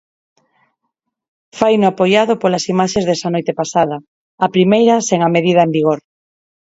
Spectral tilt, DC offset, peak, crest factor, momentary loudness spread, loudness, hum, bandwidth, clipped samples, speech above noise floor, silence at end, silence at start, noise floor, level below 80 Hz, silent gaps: -5.5 dB/octave; under 0.1%; 0 dBFS; 16 dB; 7 LU; -14 LUFS; none; 8 kHz; under 0.1%; 60 dB; 0.75 s; 1.55 s; -74 dBFS; -56 dBFS; 4.08-4.38 s